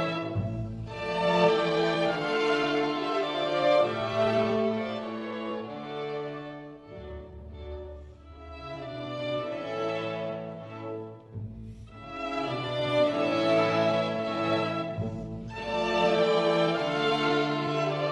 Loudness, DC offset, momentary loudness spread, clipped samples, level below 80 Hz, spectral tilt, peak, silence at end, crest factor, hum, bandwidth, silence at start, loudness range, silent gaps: -28 LUFS; under 0.1%; 18 LU; under 0.1%; -52 dBFS; -6 dB/octave; -10 dBFS; 0 s; 18 dB; none; 11 kHz; 0 s; 12 LU; none